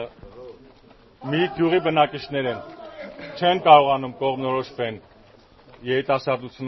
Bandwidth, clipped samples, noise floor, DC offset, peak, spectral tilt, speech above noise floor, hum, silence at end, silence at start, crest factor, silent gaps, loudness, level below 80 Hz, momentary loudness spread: 6 kHz; under 0.1%; -51 dBFS; under 0.1%; 0 dBFS; -3.5 dB/octave; 31 dB; none; 0 s; 0 s; 22 dB; none; -21 LUFS; -58 dBFS; 24 LU